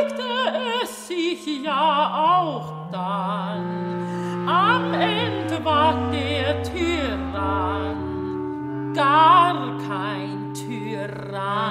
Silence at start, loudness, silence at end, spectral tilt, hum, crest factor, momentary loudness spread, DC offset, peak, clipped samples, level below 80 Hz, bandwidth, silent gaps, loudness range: 0 s; -22 LUFS; 0 s; -5.5 dB/octave; none; 18 dB; 11 LU; under 0.1%; -4 dBFS; under 0.1%; -46 dBFS; 16 kHz; none; 3 LU